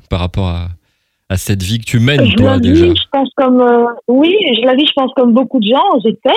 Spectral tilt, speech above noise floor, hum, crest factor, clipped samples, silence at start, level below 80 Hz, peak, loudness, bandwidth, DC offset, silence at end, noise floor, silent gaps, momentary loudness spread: -6 dB/octave; 52 dB; none; 12 dB; 0.1%; 0.1 s; -34 dBFS; 0 dBFS; -11 LUFS; 15.5 kHz; under 0.1%; 0 s; -62 dBFS; none; 9 LU